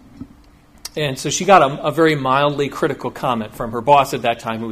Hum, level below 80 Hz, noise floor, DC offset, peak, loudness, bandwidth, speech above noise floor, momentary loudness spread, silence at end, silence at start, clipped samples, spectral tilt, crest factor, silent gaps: none; -48 dBFS; -48 dBFS; under 0.1%; 0 dBFS; -17 LUFS; 15.5 kHz; 31 dB; 11 LU; 0 s; 0.15 s; under 0.1%; -4.5 dB/octave; 18 dB; none